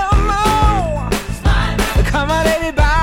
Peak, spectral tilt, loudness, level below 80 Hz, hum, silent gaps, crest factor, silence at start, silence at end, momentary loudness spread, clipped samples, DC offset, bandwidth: -4 dBFS; -5 dB/octave; -16 LUFS; -18 dBFS; none; none; 10 dB; 0 s; 0 s; 5 LU; under 0.1%; under 0.1%; 16.5 kHz